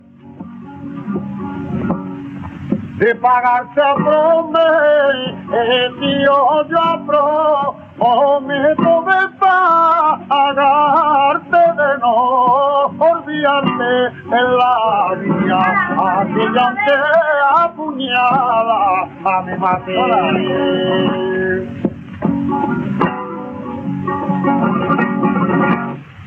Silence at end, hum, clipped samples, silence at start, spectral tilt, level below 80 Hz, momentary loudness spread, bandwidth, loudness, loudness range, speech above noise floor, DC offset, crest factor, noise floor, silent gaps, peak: 0 s; none; under 0.1%; 0.25 s; -8 dB/octave; -52 dBFS; 11 LU; 6 kHz; -14 LUFS; 6 LU; 21 dB; under 0.1%; 14 dB; -34 dBFS; none; 0 dBFS